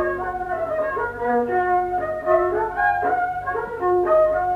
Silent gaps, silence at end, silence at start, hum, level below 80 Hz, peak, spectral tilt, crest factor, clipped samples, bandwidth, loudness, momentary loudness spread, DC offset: none; 0 s; 0 s; 50 Hz at -50 dBFS; -46 dBFS; -6 dBFS; -7.5 dB/octave; 14 dB; under 0.1%; 6 kHz; -21 LUFS; 8 LU; under 0.1%